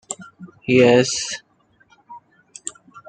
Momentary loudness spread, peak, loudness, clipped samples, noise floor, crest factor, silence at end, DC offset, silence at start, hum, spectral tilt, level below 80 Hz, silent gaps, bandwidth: 20 LU; -2 dBFS; -17 LUFS; under 0.1%; -57 dBFS; 20 dB; 0.1 s; under 0.1%; 0.1 s; none; -4 dB/octave; -62 dBFS; none; 9.4 kHz